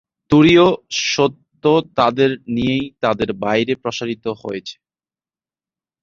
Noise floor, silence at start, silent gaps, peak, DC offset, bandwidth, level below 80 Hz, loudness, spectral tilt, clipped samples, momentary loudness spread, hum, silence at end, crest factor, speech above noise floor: under -90 dBFS; 0.3 s; none; -2 dBFS; under 0.1%; 7.6 kHz; -50 dBFS; -17 LUFS; -5 dB/octave; under 0.1%; 14 LU; none; 1.3 s; 16 dB; over 74 dB